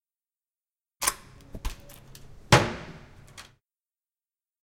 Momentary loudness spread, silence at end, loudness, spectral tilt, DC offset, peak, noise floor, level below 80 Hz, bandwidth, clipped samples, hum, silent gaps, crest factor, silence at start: 27 LU; 1.2 s; -24 LUFS; -3.5 dB/octave; under 0.1%; -2 dBFS; under -90 dBFS; -44 dBFS; 17 kHz; under 0.1%; none; none; 28 dB; 1 s